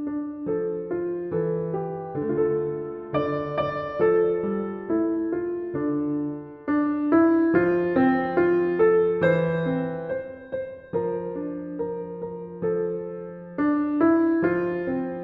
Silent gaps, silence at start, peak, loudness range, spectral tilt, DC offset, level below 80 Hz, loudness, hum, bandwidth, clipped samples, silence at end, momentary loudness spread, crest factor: none; 0 s; -8 dBFS; 8 LU; -10.5 dB/octave; under 0.1%; -58 dBFS; -25 LUFS; none; 5 kHz; under 0.1%; 0 s; 12 LU; 16 dB